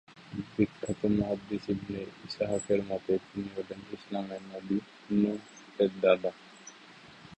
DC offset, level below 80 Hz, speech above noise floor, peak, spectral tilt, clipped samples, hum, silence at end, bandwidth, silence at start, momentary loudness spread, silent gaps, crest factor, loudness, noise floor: under 0.1%; -60 dBFS; 22 dB; -10 dBFS; -6.5 dB/octave; under 0.1%; none; 0.05 s; 8.6 kHz; 0.1 s; 20 LU; none; 22 dB; -32 LUFS; -53 dBFS